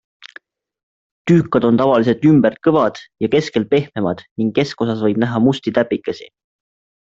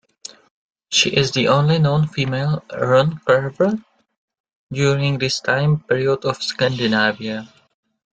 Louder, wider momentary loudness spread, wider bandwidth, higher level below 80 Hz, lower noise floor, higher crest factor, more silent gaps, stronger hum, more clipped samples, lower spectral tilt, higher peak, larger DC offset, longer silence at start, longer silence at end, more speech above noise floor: about the same, -16 LUFS vs -18 LUFS; second, 9 LU vs 12 LU; second, 7.8 kHz vs 9 kHz; about the same, -54 dBFS vs -54 dBFS; about the same, -45 dBFS vs -42 dBFS; about the same, 16 dB vs 18 dB; second, 4.31-4.36 s vs 4.17-4.28 s, 4.40-4.44 s, 4.55-4.67 s; neither; neither; first, -7.5 dB/octave vs -5 dB/octave; about the same, 0 dBFS vs -2 dBFS; neither; first, 1.25 s vs 0.9 s; first, 0.85 s vs 0.65 s; first, 29 dB vs 24 dB